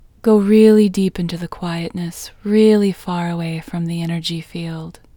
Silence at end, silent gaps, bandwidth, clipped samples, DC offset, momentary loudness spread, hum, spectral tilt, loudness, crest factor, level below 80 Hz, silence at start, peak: 0.25 s; none; 19 kHz; under 0.1%; under 0.1%; 16 LU; none; -7 dB/octave; -17 LUFS; 16 dB; -48 dBFS; 0.25 s; 0 dBFS